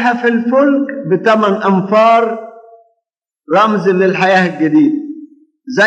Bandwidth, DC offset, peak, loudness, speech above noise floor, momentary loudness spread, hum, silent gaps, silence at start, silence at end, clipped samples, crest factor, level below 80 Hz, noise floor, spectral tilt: 8.6 kHz; under 0.1%; 0 dBFS; -12 LUFS; 63 dB; 10 LU; none; none; 0 s; 0 s; under 0.1%; 12 dB; -78 dBFS; -75 dBFS; -6.5 dB/octave